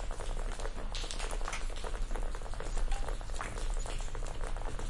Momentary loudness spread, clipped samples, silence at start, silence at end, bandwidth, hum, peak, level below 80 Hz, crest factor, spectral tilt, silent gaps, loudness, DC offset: 3 LU; under 0.1%; 0 s; 0 s; 11.5 kHz; none; -18 dBFS; -36 dBFS; 16 dB; -3.5 dB/octave; none; -41 LUFS; under 0.1%